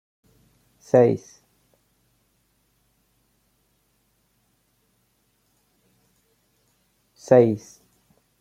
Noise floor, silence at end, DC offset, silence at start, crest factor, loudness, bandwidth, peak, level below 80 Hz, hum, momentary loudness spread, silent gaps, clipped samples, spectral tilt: -68 dBFS; 0.85 s; under 0.1%; 0.95 s; 24 dB; -20 LUFS; 9.6 kHz; -2 dBFS; -68 dBFS; none; 15 LU; none; under 0.1%; -8 dB/octave